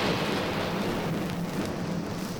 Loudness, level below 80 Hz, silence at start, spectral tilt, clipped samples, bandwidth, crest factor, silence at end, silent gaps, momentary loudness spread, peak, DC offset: -30 LUFS; -52 dBFS; 0 s; -5.5 dB/octave; under 0.1%; over 20 kHz; 14 dB; 0 s; none; 4 LU; -14 dBFS; under 0.1%